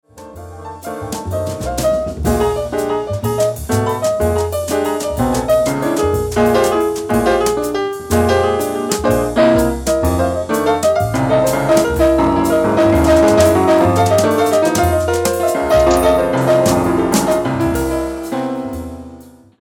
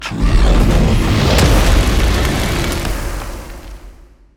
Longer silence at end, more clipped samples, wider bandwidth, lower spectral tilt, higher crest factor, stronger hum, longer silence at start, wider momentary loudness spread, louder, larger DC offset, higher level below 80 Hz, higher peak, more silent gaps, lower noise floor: second, 0.3 s vs 0.45 s; neither; first, 18.5 kHz vs 16.5 kHz; about the same, -5.5 dB/octave vs -5 dB/octave; about the same, 14 dB vs 12 dB; neither; first, 0.15 s vs 0 s; second, 9 LU vs 16 LU; about the same, -15 LUFS vs -15 LUFS; neither; second, -30 dBFS vs -16 dBFS; about the same, 0 dBFS vs 0 dBFS; neither; about the same, -39 dBFS vs -40 dBFS